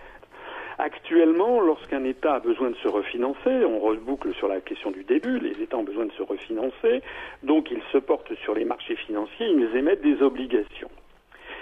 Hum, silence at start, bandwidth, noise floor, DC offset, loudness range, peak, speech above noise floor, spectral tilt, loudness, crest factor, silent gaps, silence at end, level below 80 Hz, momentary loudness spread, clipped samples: none; 0 s; 4.3 kHz; -48 dBFS; under 0.1%; 4 LU; -8 dBFS; 23 dB; -6.5 dB/octave; -25 LUFS; 16 dB; none; 0 s; -56 dBFS; 12 LU; under 0.1%